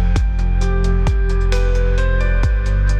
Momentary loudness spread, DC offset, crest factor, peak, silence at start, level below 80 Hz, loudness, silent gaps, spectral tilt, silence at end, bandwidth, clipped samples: 1 LU; under 0.1%; 10 dB; -4 dBFS; 0 s; -14 dBFS; -18 LUFS; none; -6.5 dB/octave; 0 s; 8.2 kHz; under 0.1%